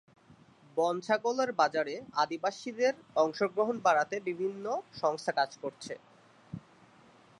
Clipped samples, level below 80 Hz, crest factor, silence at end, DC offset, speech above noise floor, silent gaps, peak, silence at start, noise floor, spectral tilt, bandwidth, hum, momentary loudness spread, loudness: under 0.1%; -76 dBFS; 20 dB; 0.8 s; under 0.1%; 29 dB; none; -14 dBFS; 0.75 s; -60 dBFS; -4 dB/octave; 11 kHz; none; 16 LU; -31 LUFS